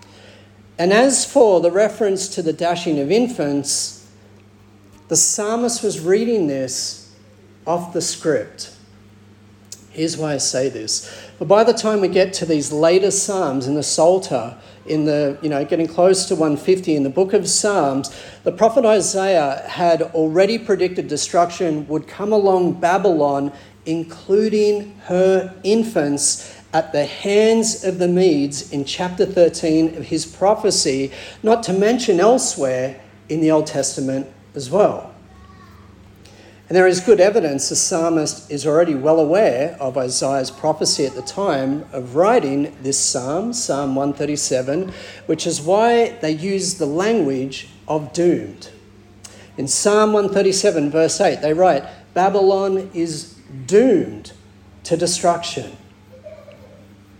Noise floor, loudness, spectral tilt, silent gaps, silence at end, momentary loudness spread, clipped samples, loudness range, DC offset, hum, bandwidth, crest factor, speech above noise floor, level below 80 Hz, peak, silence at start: -47 dBFS; -18 LUFS; -4 dB/octave; none; 0.65 s; 10 LU; under 0.1%; 5 LU; under 0.1%; none; 17 kHz; 16 dB; 30 dB; -58 dBFS; -2 dBFS; 0.8 s